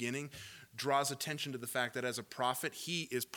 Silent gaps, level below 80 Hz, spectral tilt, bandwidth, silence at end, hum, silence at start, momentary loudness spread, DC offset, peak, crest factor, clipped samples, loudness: none; -78 dBFS; -3 dB/octave; 19 kHz; 0 s; none; 0 s; 9 LU; under 0.1%; -20 dBFS; 20 dB; under 0.1%; -37 LUFS